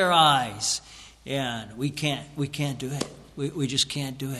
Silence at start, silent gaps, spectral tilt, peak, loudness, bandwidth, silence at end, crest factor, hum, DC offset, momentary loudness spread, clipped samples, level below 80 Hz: 0 s; none; -3.5 dB/octave; -6 dBFS; -26 LUFS; 14 kHz; 0 s; 20 dB; none; under 0.1%; 13 LU; under 0.1%; -56 dBFS